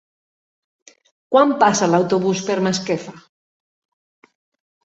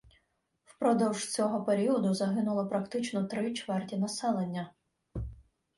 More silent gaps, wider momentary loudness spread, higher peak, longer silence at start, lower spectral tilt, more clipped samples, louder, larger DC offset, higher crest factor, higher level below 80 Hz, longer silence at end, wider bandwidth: neither; second, 10 LU vs 14 LU; first, -2 dBFS vs -16 dBFS; first, 1.3 s vs 0.8 s; about the same, -4.5 dB/octave vs -5.5 dB/octave; neither; first, -18 LUFS vs -31 LUFS; neither; about the same, 20 dB vs 16 dB; second, -64 dBFS vs -54 dBFS; first, 1.65 s vs 0.35 s; second, 8.2 kHz vs 11.5 kHz